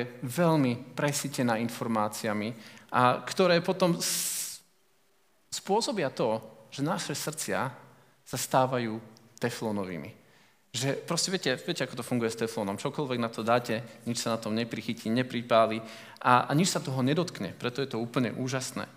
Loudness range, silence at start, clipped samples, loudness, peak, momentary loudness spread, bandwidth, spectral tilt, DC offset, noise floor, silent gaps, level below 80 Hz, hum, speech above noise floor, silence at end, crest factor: 5 LU; 0 s; under 0.1%; -29 LUFS; -6 dBFS; 11 LU; 16 kHz; -4.5 dB/octave; under 0.1%; -69 dBFS; none; -78 dBFS; none; 40 dB; 0.05 s; 24 dB